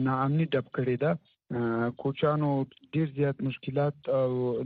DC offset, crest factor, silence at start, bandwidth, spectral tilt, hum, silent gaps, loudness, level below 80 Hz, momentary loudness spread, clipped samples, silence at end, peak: under 0.1%; 14 dB; 0 s; 4.7 kHz; -7 dB/octave; none; none; -29 LUFS; -66 dBFS; 6 LU; under 0.1%; 0 s; -14 dBFS